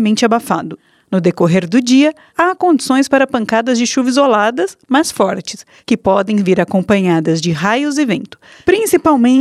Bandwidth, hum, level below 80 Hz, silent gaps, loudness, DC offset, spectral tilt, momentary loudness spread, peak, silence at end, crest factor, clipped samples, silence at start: 14.5 kHz; none; -52 dBFS; none; -13 LUFS; under 0.1%; -5 dB/octave; 8 LU; 0 dBFS; 0 s; 14 dB; under 0.1%; 0 s